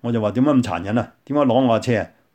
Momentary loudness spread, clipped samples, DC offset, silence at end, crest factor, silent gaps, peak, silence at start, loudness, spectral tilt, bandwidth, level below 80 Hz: 7 LU; under 0.1%; under 0.1%; 0.25 s; 14 dB; none; -4 dBFS; 0.05 s; -19 LUFS; -7.5 dB/octave; 9 kHz; -56 dBFS